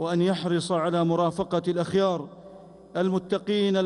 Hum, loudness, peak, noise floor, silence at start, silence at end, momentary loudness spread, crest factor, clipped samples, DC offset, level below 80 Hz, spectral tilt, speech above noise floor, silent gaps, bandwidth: none; -26 LUFS; -12 dBFS; -47 dBFS; 0 s; 0 s; 4 LU; 12 dB; under 0.1%; under 0.1%; -62 dBFS; -6.5 dB/octave; 22 dB; none; 11 kHz